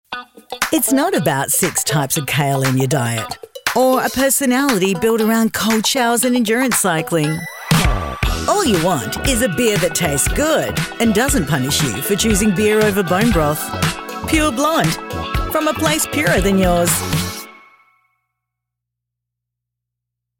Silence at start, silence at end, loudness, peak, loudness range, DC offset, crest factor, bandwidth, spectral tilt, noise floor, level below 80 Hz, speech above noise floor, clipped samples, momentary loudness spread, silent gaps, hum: 0.1 s; 2.85 s; -16 LUFS; -2 dBFS; 3 LU; under 0.1%; 16 dB; 17.5 kHz; -4 dB/octave; -80 dBFS; -32 dBFS; 65 dB; under 0.1%; 7 LU; none; 60 Hz at -45 dBFS